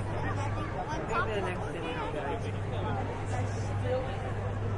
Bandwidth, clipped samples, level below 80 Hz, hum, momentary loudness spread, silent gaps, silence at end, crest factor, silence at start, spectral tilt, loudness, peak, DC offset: 11 kHz; under 0.1%; -44 dBFS; none; 3 LU; none; 0 s; 16 dB; 0 s; -6.5 dB/octave; -33 LUFS; -16 dBFS; under 0.1%